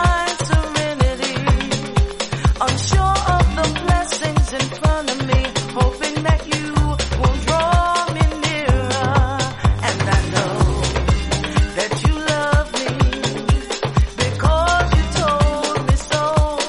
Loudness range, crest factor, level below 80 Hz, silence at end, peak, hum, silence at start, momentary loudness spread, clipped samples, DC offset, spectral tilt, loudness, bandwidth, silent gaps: 1 LU; 14 dB; -22 dBFS; 0 s; -2 dBFS; none; 0 s; 4 LU; under 0.1%; under 0.1%; -5 dB/octave; -18 LUFS; 11.5 kHz; none